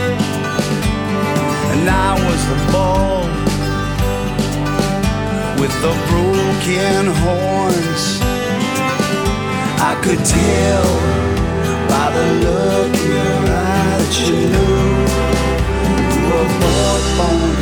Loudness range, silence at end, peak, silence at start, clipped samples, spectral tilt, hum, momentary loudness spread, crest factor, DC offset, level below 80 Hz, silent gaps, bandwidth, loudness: 2 LU; 0 s; 0 dBFS; 0 s; under 0.1%; -5 dB/octave; none; 4 LU; 14 dB; under 0.1%; -24 dBFS; none; 19.5 kHz; -15 LUFS